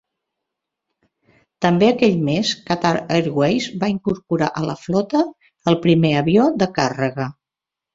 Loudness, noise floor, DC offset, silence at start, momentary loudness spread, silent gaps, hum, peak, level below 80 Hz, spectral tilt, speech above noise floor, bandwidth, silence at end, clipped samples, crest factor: -19 LUFS; -87 dBFS; under 0.1%; 1.6 s; 8 LU; none; none; -2 dBFS; -54 dBFS; -6 dB/octave; 69 dB; 7.8 kHz; 0.65 s; under 0.1%; 18 dB